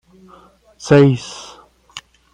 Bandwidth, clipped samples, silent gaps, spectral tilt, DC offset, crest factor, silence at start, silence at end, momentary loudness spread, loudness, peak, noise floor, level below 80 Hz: 10 kHz; under 0.1%; none; -6.5 dB/octave; under 0.1%; 18 dB; 0.85 s; 0.35 s; 24 LU; -13 LUFS; -2 dBFS; -48 dBFS; -54 dBFS